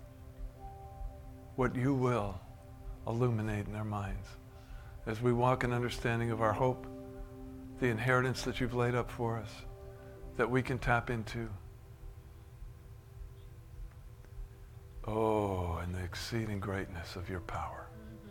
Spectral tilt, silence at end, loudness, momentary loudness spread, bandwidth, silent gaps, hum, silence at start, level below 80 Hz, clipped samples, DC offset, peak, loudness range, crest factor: -6.5 dB/octave; 0 s; -35 LUFS; 22 LU; 16.5 kHz; none; none; 0 s; -50 dBFS; under 0.1%; under 0.1%; -14 dBFS; 7 LU; 22 dB